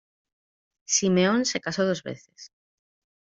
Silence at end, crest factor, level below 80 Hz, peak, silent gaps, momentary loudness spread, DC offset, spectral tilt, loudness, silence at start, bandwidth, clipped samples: 0.8 s; 20 dB; -68 dBFS; -8 dBFS; none; 14 LU; under 0.1%; -3.5 dB/octave; -24 LUFS; 0.9 s; 7.8 kHz; under 0.1%